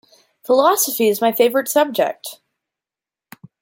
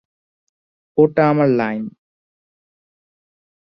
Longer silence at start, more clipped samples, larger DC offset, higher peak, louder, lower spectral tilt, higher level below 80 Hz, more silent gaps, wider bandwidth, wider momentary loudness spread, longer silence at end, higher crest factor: second, 0.5 s vs 0.95 s; neither; neither; about the same, -2 dBFS vs -2 dBFS; about the same, -17 LUFS vs -17 LUFS; second, -2.5 dB/octave vs -10 dB/octave; second, -72 dBFS vs -60 dBFS; neither; first, 17 kHz vs 5.8 kHz; first, 16 LU vs 13 LU; second, 1.3 s vs 1.8 s; about the same, 18 dB vs 20 dB